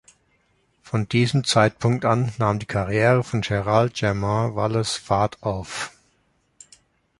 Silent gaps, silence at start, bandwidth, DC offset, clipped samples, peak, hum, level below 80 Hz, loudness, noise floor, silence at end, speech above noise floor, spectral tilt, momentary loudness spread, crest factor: none; 0.85 s; 11.5 kHz; under 0.1%; under 0.1%; -2 dBFS; none; -48 dBFS; -22 LUFS; -66 dBFS; 1.3 s; 45 dB; -5.5 dB/octave; 9 LU; 20 dB